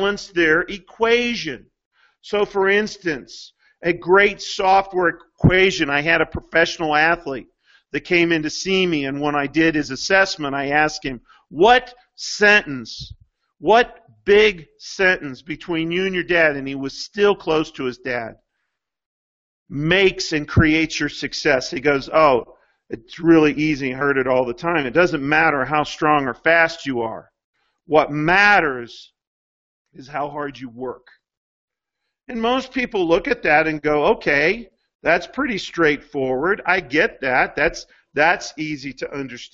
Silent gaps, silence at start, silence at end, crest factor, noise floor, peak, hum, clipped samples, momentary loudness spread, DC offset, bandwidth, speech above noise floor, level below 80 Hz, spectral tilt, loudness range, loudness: 1.85-1.91 s, 19.06-19.66 s, 27.44-27.53 s, 29.27-29.85 s, 31.37-31.68 s, 34.95-34.99 s; 0 s; 0.05 s; 20 dB; -80 dBFS; 0 dBFS; none; under 0.1%; 15 LU; under 0.1%; 7.8 kHz; 61 dB; -44 dBFS; -5 dB/octave; 4 LU; -18 LUFS